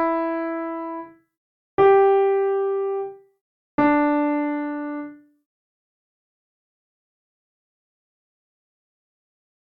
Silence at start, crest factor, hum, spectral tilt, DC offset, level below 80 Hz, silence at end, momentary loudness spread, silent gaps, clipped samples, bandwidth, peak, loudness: 0 s; 18 dB; none; -9 dB/octave; under 0.1%; -62 dBFS; 4.5 s; 16 LU; 1.37-1.78 s, 3.41-3.78 s; under 0.1%; 4.2 kHz; -6 dBFS; -21 LUFS